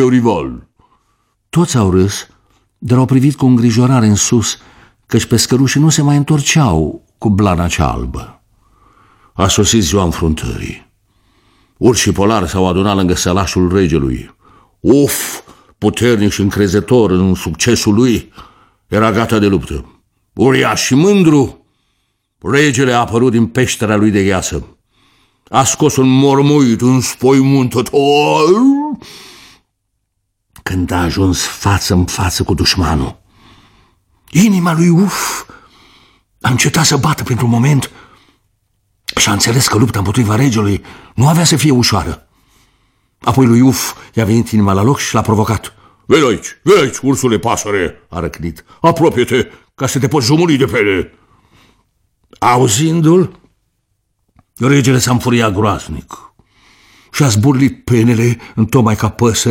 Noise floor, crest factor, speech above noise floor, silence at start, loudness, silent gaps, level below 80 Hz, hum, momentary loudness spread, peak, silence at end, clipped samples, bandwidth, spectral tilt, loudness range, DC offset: -68 dBFS; 12 dB; 57 dB; 0 s; -12 LUFS; none; -34 dBFS; none; 11 LU; 0 dBFS; 0 s; under 0.1%; 16.5 kHz; -5 dB/octave; 4 LU; under 0.1%